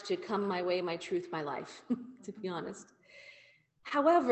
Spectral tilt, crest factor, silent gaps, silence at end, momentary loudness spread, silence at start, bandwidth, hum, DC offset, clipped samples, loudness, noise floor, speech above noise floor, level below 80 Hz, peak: -5.5 dB/octave; 20 dB; none; 0 s; 23 LU; 0 s; 8.6 kHz; none; under 0.1%; under 0.1%; -35 LUFS; -64 dBFS; 30 dB; -78 dBFS; -14 dBFS